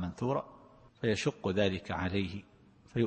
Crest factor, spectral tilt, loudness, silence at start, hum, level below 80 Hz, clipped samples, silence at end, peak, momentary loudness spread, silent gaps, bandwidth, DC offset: 20 dB; -6 dB/octave; -34 LUFS; 0 s; none; -60 dBFS; under 0.1%; 0 s; -14 dBFS; 9 LU; none; 8.8 kHz; under 0.1%